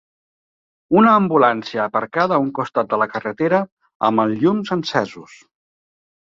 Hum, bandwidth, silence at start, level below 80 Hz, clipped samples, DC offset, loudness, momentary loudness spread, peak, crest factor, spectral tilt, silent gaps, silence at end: none; 7.6 kHz; 0.9 s; -62 dBFS; under 0.1%; under 0.1%; -18 LUFS; 9 LU; -2 dBFS; 18 dB; -7 dB/octave; 3.72-3.77 s, 3.95-4.00 s; 1.05 s